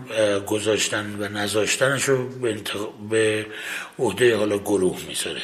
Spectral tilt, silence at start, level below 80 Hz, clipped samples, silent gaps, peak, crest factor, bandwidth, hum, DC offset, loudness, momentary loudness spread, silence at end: -3.5 dB/octave; 0 s; -56 dBFS; under 0.1%; none; -6 dBFS; 18 dB; 15.5 kHz; none; under 0.1%; -23 LUFS; 9 LU; 0 s